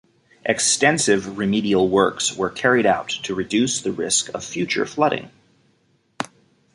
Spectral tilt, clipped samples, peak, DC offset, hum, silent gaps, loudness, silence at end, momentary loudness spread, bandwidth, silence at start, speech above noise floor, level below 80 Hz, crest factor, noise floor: -3 dB/octave; under 0.1%; -2 dBFS; under 0.1%; none; none; -20 LUFS; 0.5 s; 12 LU; 11.5 kHz; 0.45 s; 43 dB; -56 dBFS; 20 dB; -63 dBFS